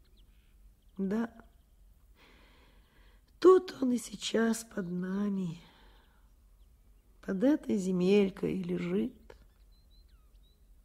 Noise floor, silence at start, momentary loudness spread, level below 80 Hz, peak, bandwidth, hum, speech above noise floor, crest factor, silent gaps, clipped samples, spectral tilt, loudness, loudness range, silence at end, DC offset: -62 dBFS; 1 s; 14 LU; -62 dBFS; -12 dBFS; 15 kHz; none; 30 dB; 22 dB; none; under 0.1%; -6 dB/octave; -31 LUFS; 6 LU; 1.7 s; under 0.1%